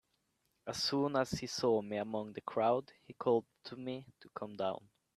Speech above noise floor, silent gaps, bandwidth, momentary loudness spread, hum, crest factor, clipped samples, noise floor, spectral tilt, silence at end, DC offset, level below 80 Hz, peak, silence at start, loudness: 44 dB; none; 14 kHz; 15 LU; none; 20 dB; under 0.1%; -80 dBFS; -5 dB/octave; 0.4 s; under 0.1%; -72 dBFS; -18 dBFS; 0.65 s; -36 LUFS